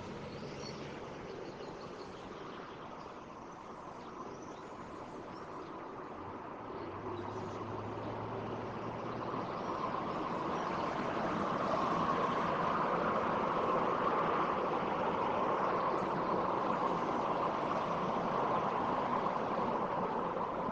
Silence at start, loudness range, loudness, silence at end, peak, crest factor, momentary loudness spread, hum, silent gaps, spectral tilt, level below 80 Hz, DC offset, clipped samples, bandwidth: 0 s; 13 LU; -36 LUFS; 0 s; -20 dBFS; 16 dB; 14 LU; none; none; -6.5 dB/octave; -64 dBFS; under 0.1%; under 0.1%; 9 kHz